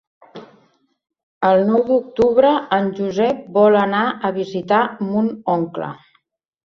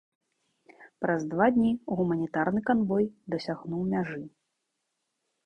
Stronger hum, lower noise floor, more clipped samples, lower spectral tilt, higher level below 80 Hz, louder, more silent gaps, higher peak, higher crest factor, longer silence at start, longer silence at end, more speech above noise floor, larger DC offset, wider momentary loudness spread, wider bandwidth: neither; second, -64 dBFS vs -81 dBFS; neither; about the same, -7.5 dB/octave vs -8 dB/octave; first, -58 dBFS vs -64 dBFS; first, -17 LUFS vs -28 LUFS; first, 1.23-1.41 s vs none; first, -2 dBFS vs -10 dBFS; about the same, 16 dB vs 20 dB; second, 0.35 s vs 0.8 s; second, 0.7 s vs 1.15 s; second, 47 dB vs 54 dB; neither; about the same, 8 LU vs 10 LU; about the same, 6.8 kHz vs 6.8 kHz